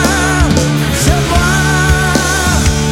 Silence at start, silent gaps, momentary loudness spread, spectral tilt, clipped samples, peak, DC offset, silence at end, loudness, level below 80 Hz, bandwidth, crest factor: 0 s; none; 1 LU; -4 dB/octave; under 0.1%; 0 dBFS; under 0.1%; 0 s; -11 LUFS; -18 dBFS; 16.5 kHz; 10 dB